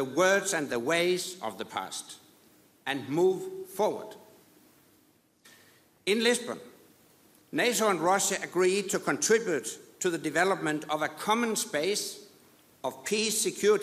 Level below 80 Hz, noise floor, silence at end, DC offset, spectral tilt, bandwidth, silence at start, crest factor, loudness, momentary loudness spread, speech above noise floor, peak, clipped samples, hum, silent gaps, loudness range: -76 dBFS; -65 dBFS; 0 s; under 0.1%; -2.5 dB/octave; 15.5 kHz; 0 s; 18 dB; -29 LUFS; 13 LU; 37 dB; -12 dBFS; under 0.1%; none; none; 6 LU